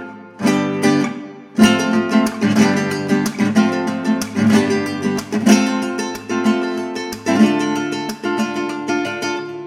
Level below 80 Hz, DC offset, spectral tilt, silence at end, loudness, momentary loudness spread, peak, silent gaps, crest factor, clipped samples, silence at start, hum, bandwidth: -56 dBFS; under 0.1%; -5 dB/octave; 0 s; -17 LUFS; 9 LU; 0 dBFS; none; 18 dB; under 0.1%; 0 s; none; 15 kHz